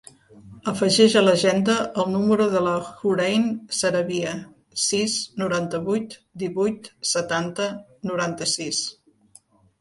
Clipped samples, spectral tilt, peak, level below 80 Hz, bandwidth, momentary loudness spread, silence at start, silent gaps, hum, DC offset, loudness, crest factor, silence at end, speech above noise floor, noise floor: under 0.1%; -4 dB/octave; -2 dBFS; -62 dBFS; 11.5 kHz; 12 LU; 0.35 s; none; none; under 0.1%; -22 LUFS; 20 dB; 0.9 s; 33 dB; -55 dBFS